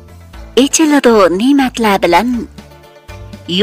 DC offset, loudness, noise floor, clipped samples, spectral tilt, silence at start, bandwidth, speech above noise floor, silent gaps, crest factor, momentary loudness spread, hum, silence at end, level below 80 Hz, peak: under 0.1%; -11 LUFS; -38 dBFS; under 0.1%; -3.5 dB/octave; 0.1 s; 16 kHz; 28 dB; none; 12 dB; 17 LU; none; 0 s; -38 dBFS; 0 dBFS